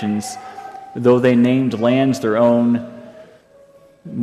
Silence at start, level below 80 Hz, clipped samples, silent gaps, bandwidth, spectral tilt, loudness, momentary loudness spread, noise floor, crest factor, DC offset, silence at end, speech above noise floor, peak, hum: 0 s; -62 dBFS; under 0.1%; none; 13 kHz; -7 dB/octave; -16 LUFS; 19 LU; -48 dBFS; 14 dB; under 0.1%; 0 s; 32 dB; -2 dBFS; none